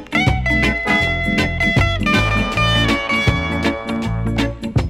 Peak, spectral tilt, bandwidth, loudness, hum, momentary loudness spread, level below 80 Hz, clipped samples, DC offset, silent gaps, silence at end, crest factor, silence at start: -6 dBFS; -5.5 dB/octave; 15.5 kHz; -17 LUFS; none; 5 LU; -26 dBFS; under 0.1%; under 0.1%; none; 0 s; 12 dB; 0 s